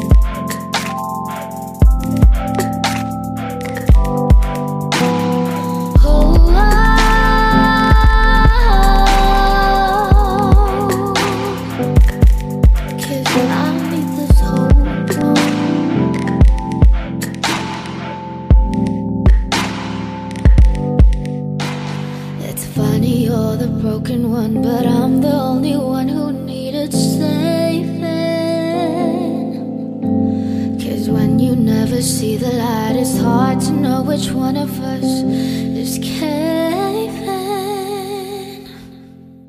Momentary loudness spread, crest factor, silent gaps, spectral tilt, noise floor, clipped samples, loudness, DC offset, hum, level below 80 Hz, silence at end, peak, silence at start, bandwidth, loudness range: 11 LU; 14 dB; none; -6 dB/octave; -38 dBFS; under 0.1%; -15 LUFS; under 0.1%; none; -16 dBFS; 0.2 s; 0 dBFS; 0 s; 15.5 kHz; 6 LU